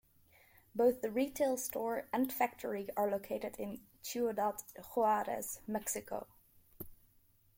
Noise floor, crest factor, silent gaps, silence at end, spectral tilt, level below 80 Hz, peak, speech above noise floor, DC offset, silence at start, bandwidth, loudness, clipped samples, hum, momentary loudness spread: -69 dBFS; 20 dB; none; 0.65 s; -4 dB/octave; -70 dBFS; -18 dBFS; 33 dB; under 0.1%; 0.75 s; 16.5 kHz; -37 LUFS; under 0.1%; none; 14 LU